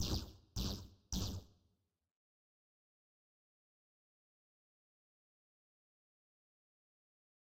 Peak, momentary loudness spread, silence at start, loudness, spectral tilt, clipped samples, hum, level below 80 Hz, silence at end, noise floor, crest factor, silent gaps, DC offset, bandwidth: -26 dBFS; 7 LU; 0 s; -44 LUFS; -4.5 dB/octave; under 0.1%; none; -56 dBFS; 6 s; -81 dBFS; 24 dB; none; under 0.1%; 16 kHz